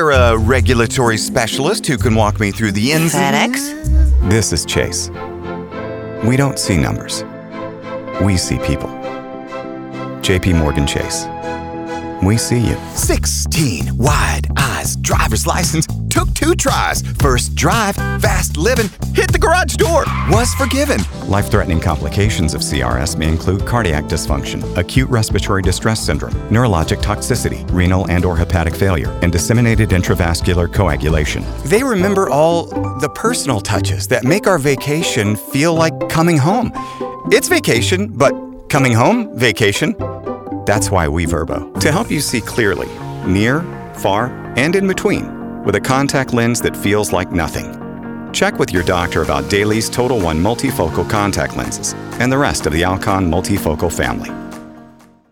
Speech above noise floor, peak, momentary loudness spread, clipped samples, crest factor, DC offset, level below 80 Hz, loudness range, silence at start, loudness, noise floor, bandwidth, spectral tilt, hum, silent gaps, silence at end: 28 dB; 0 dBFS; 10 LU; under 0.1%; 14 dB; under 0.1%; -26 dBFS; 3 LU; 0 s; -15 LUFS; -43 dBFS; 20 kHz; -5 dB/octave; none; none; 0.45 s